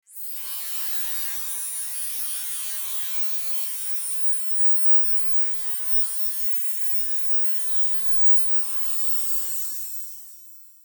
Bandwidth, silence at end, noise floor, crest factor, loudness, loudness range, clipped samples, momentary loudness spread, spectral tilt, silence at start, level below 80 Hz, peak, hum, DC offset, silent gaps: over 20 kHz; 0.15 s; -46 dBFS; 14 dB; -20 LUFS; 6 LU; under 0.1%; 12 LU; 5 dB/octave; 0.1 s; -84 dBFS; -10 dBFS; none; under 0.1%; none